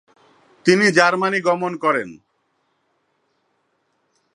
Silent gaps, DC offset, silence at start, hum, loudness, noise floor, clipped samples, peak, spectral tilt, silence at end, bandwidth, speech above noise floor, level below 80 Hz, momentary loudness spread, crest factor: none; under 0.1%; 0.65 s; none; -17 LUFS; -68 dBFS; under 0.1%; 0 dBFS; -4.5 dB/octave; 2.2 s; 11 kHz; 51 dB; -72 dBFS; 9 LU; 22 dB